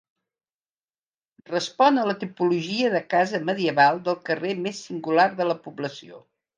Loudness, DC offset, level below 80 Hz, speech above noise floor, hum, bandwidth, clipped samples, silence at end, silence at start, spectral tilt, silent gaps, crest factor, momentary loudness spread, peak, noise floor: -23 LUFS; under 0.1%; -78 dBFS; over 67 dB; none; 9.6 kHz; under 0.1%; 0.4 s; 1.5 s; -5 dB/octave; none; 20 dB; 12 LU; -6 dBFS; under -90 dBFS